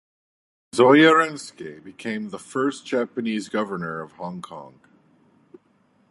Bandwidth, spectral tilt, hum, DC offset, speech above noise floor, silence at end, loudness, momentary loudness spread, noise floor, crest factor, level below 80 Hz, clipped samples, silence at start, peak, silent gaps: 11.5 kHz; -5 dB/octave; none; under 0.1%; 40 dB; 1.4 s; -21 LUFS; 23 LU; -62 dBFS; 22 dB; -70 dBFS; under 0.1%; 0.75 s; -2 dBFS; none